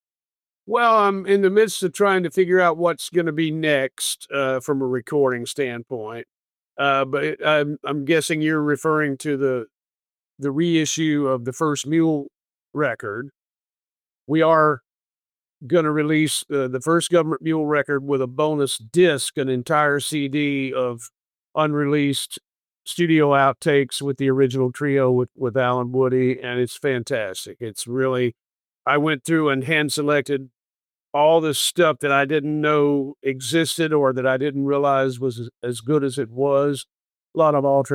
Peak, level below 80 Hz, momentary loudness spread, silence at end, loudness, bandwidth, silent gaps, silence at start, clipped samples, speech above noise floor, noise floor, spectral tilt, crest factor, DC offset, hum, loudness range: -6 dBFS; -70 dBFS; 10 LU; 0 s; -21 LUFS; 16.5 kHz; 30.90-30.94 s; 0.65 s; under 0.1%; over 70 dB; under -90 dBFS; -5 dB/octave; 14 dB; under 0.1%; none; 4 LU